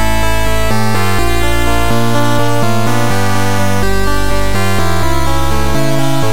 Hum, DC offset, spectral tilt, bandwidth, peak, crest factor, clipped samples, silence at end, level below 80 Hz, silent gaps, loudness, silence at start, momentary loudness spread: none; 30%; -5 dB/octave; 17 kHz; -2 dBFS; 14 dB; under 0.1%; 0 s; -22 dBFS; none; -14 LUFS; 0 s; 1 LU